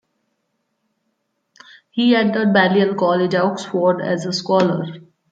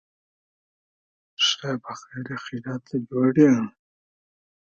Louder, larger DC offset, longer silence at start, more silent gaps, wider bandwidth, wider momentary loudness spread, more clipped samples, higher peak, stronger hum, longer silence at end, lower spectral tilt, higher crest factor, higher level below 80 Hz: first, -17 LUFS vs -23 LUFS; neither; first, 1.95 s vs 1.4 s; neither; first, 9 kHz vs 7.4 kHz; second, 7 LU vs 16 LU; neither; about the same, -2 dBFS vs -4 dBFS; neither; second, 0.3 s vs 1 s; about the same, -6 dB/octave vs -5 dB/octave; about the same, 18 dB vs 22 dB; about the same, -66 dBFS vs -68 dBFS